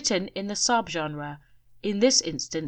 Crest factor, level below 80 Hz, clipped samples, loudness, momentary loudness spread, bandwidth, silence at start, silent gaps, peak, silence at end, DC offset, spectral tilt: 20 dB; -60 dBFS; under 0.1%; -25 LUFS; 14 LU; 10 kHz; 0 s; none; -6 dBFS; 0 s; under 0.1%; -2.5 dB/octave